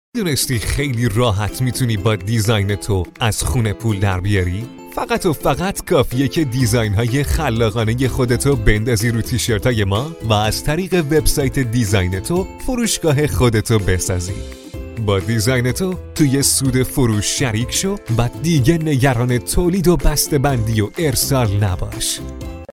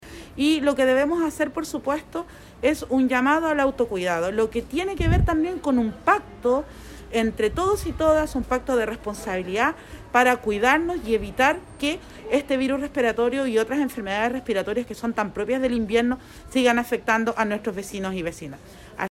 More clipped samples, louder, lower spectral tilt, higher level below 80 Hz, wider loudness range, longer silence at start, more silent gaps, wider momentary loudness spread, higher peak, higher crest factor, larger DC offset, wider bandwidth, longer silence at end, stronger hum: neither; first, -17 LUFS vs -23 LUFS; about the same, -5 dB/octave vs -5.5 dB/octave; first, -28 dBFS vs -40 dBFS; about the same, 2 LU vs 2 LU; first, 0.15 s vs 0 s; neither; second, 5 LU vs 10 LU; first, 0 dBFS vs -4 dBFS; about the same, 16 dB vs 18 dB; neither; about the same, 17 kHz vs 16 kHz; about the same, 0.05 s vs 0.05 s; neither